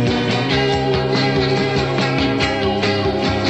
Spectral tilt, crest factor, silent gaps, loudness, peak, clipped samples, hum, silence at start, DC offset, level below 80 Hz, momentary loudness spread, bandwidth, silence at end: -6 dB/octave; 14 dB; none; -17 LUFS; -4 dBFS; under 0.1%; none; 0 s; 0.4%; -36 dBFS; 1 LU; 9.6 kHz; 0 s